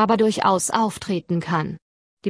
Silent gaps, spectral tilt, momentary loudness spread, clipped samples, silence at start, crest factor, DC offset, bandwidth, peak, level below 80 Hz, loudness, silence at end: 1.82-2.17 s; -5 dB/octave; 10 LU; under 0.1%; 0 s; 18 dB; under 0.1%; 11 kHz; -4 dBFS; -58 dBFS; -21 LUFS; 0 s